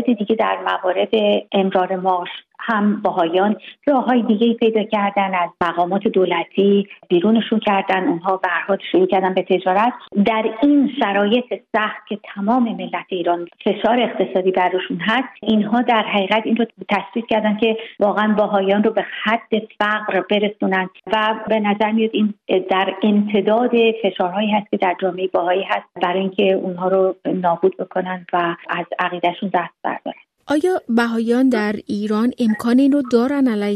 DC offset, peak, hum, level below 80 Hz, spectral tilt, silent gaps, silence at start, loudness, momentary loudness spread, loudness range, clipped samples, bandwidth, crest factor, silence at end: under 0.1%; -4 dBFS; none; -64 dBFS; -7 dB/octave; none; 0 s; -18 LUFS; 6 LU; 2 LU; under 0.1%; 11.5 kHz; 14 dB; 0 s